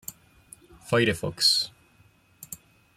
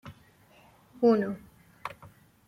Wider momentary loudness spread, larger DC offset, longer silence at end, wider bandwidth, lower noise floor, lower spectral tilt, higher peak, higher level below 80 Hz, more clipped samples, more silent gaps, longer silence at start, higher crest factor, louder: second, 22 LU vs 25 LU; neither; second, 0.4 s vs 0.6 s; about the same, 16.5 kHz vs 15 kHz; about the same, -60 dBFS vs -59 dBFS; second, -3 dB/octave vs -8 dB/octave; first, -8 dBFS vs -12 dBFS; first, -60 dBFS vs -68 dBFS; neither; neither; about the same, 0.1 s vs 0.05 s; about the same, 20 dB vs 20 dB; first, -23 LUFS vs -26 LUFS